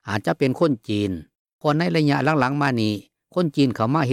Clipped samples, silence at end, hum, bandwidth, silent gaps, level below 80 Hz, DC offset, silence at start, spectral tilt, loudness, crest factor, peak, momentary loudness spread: under 0.1%; 0 s; none; 14 kHz; 1.39-1.45 s, 1.53-1.59 s; -60 dBFS; under 0.1%; 0.05 s; -7 dB/octave; -22 LUFS; 16 dB; -6 dBFS; 8 LU